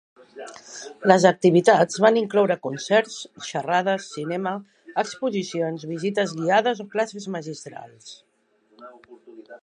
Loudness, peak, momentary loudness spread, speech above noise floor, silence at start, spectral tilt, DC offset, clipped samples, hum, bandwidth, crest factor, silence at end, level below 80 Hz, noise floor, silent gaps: -22 LUFS; 0 dBFS; 22 LU; 41 dB; 0.35 s; -5 dB/octave; under 0.1%; under 0.1%; none; 11 kHz; 22 dB; 0.05 s; -76 dBFS; -63 dBFS; none